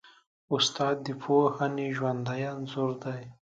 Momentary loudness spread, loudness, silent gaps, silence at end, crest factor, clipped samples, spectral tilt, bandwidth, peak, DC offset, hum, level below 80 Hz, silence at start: 9 LU; -29 LUFS; 0.27-0.48 s; 0.2 s; 18 dB; under 0.1%; -5 dB/octave; 9.2 kHz; -12 dBFS; under 0.1%; none; -74 dBFS; 0.05 s